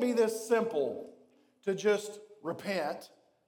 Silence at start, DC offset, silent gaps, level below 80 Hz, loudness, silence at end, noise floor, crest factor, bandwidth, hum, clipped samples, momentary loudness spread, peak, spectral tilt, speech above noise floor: 0 s; under 0.1%; none; -90 dBFS; -33 LUFS; 0.4 s; -64 dBFS; 16 dB; 18 kHz; none; under 0.1%; 15 LU; -16 dBFS; -4.5 dB/octave; 32 dB